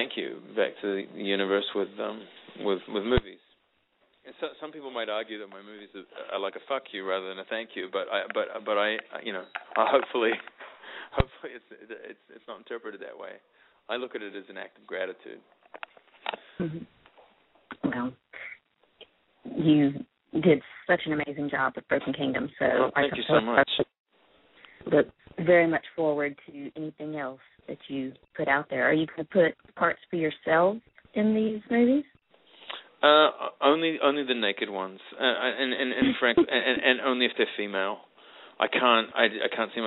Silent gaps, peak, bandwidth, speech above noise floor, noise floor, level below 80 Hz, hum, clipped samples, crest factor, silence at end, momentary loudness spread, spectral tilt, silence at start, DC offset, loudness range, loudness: 24.00-24.05 s; -4 dBFS; 4.1 kHz; 43 dB; -70 dBFS; -52 dBFS; none; under 0.1%; 24 dB; 0 s; 20 LU; -2.5 dB/octave; 0 s; under 0.1%; 13 LU; -27 LUFS